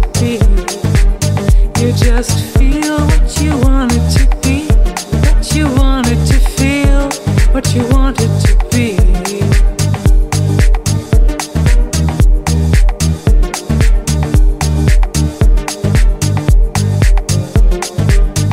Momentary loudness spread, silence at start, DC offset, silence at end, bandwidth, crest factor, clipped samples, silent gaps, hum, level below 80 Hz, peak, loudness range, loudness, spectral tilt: 3 LU; 0 s; under 0.1%; 0 s; 15.5 kHz; 10 dB; under 0.1%; none; none; -12 dBFS; 0 dBFS; 1 LU; -13 LUFS; -5.5 dB/octave